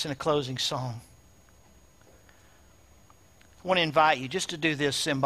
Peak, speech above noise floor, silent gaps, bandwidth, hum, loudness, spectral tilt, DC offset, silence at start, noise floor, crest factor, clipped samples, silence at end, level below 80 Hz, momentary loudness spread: -8 dBFS; 31 dB; none; 15.5 kHz; none; -27 LUFS; -3.5 dB/octave; under 0.1%; 0 s; -58 dBFS; 22 dB; under 0.1%; 0 s; -62 dBFS; 14 LU